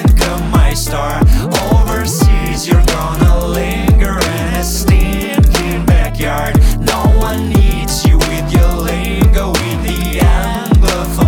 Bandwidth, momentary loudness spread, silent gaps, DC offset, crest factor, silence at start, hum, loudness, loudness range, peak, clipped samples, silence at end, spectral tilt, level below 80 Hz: 18 kHz; 4 LU; none; under 0.1%; 10 dB; 0 s; none; -13 LUFS; 1 LU; -2 dBFS; under 0.1%; 0 s; -5.5 dB/octave; -14 dBFS